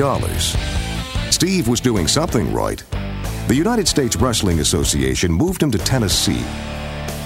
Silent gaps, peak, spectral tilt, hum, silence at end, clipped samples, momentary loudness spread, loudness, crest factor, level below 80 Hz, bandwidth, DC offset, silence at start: none; -2 dBFS; -4 dB/octave; none; 0 s; under 0.1%; 10 LU; -18 LUFS; 16 dB; -28 dBFS; 16 kHz; under 0.1%; 0 s